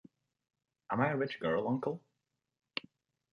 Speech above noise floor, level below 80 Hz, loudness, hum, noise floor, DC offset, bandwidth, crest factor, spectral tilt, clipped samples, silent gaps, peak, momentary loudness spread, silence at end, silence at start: 52 dB; -74 dBFS; -36 LUFS; none; -86 dBFS; under 0.1%; 6.8 kHz; 22 dB; -8 dB/octave; under 0.1%; none; -16 dBFS; 10 LU; 0.55 s; 0.9 s